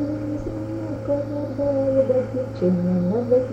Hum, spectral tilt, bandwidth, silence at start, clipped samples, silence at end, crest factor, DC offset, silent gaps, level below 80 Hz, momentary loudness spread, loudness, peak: none; -10 dB/octave; 8 kHz; 0 s; under 0.1%; 0 s; 14 dB; under 0.1%; none; -44 dBFS; 9 LU; -23 LUFS; -8 dBFS